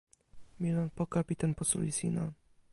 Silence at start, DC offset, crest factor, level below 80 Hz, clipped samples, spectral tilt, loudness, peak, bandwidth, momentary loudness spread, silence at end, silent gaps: 0.35 s; under 0.1%; 20 dB; -60 dBFS; under 0.1%; -5.5 dB/octave; -34 LUFS; -16 dBFS; 11.5 kHz; 6 LU; 0.4 s; none